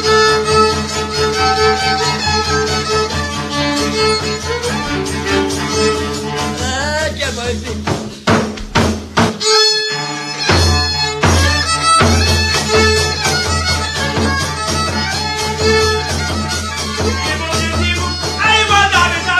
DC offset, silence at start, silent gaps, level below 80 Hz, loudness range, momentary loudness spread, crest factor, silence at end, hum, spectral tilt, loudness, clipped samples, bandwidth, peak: under 0.1%; 0 s; none; -28 dBFS; 5 LU; 8 LU; 14 dB; 0 s; none; -3.5 dB/octave; -14 LUFS; under 0.1%; 14 kHz; 0 dBFS